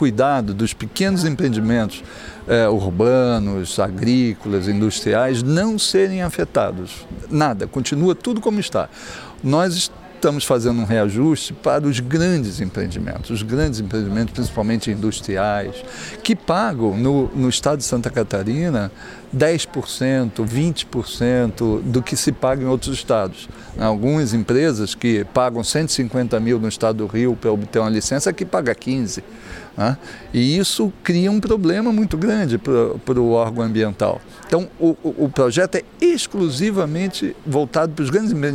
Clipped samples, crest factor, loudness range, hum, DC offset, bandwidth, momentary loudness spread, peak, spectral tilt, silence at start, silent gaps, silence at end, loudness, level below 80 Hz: under 0.1%; 18 dB; 3 LU; none; under 0.1%; 16.5 kHz; 7 LU; -2 dBFS; -5.5 dB/octave; 0 s; none; 0 s; -19 LUFS; -40 dBFS